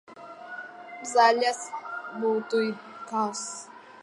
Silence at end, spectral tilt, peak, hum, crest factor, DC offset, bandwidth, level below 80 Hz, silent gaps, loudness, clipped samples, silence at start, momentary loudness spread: 0 s; -2.5 dB/octave; -8 dBFS; none; 20 dB; under 0.1%; 11.5 kHz; -86 dBFS; none; -27 LUFS; under 0.1%; 0.1 s; 20 LU